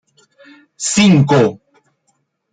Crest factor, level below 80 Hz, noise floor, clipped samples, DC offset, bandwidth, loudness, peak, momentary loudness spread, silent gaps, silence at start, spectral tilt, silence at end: 16 dB; -52 dBFS; -65 dBFS; under 0.1%; under 0.1%; 9.4 kHz; -13 LUFS; 0 dBFS; 8 LU; none; 0.8 s; -5 dB/octave; 1 s